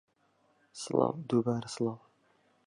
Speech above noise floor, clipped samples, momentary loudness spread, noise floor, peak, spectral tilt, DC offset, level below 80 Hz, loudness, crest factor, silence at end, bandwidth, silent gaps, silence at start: 40 dB; under 0.1%; 17 LU; -71 dBFS; -12 dBFS; -6.5 dB/octave; under 0.1%; -74 dBFS; -32 LUFS; 22 dB; 0.7 s; 11 kHz; none; 0.75 s